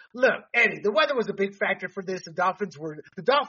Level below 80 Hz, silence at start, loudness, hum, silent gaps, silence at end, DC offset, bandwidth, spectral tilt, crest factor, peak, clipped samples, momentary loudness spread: -76 dBFS; 0.15 s; -25 LUFS; none; none; 0 s; under 0.1%; 7.2 kHz; -1.5 dB/octave; 16 dB; -10 dBFS; under 0.1%; 12 LU